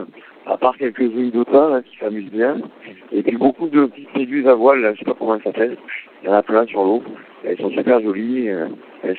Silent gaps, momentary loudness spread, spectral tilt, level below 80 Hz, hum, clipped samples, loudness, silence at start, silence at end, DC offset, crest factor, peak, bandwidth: none; 14 LU; -9 dB/octave; -72 dBFS; none; under 0.1%; -18 LUFS; 0 s; 0 s; under 0.1%; 18 dB; 0 dBFS; 4.4 kHz